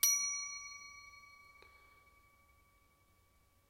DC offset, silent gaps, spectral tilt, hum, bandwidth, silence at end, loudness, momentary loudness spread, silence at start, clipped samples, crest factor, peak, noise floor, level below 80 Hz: under 0.1%; none; 3.5 dB/octave; none; 16 kHz; 2.3 s; -37 LUFS; 27 LU; 0 s; under 0.1%; 28 dB; -14 dBFS; -71 dBFS; -74 dBFS